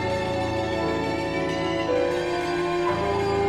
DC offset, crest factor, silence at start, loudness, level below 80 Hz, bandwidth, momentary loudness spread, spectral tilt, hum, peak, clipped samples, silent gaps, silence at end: under 0.1%; 12 dB; 0 s; -25 LUFS; -44 dBFS; 12.5 kHz; 2 LU; -6 dB/octave; none; -14 dBFS; under 0.1%; none; 0 s